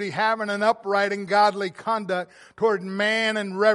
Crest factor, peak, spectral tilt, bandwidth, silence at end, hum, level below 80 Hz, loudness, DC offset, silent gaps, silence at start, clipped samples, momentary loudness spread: 18 dB; -6 dBFS; -4.5 dB/octave; 11.5 kHz; 0 s; none; -74 dBFS; -23 LUFS; under 0.1%; none; 0 s; under 0.1%; 8 LU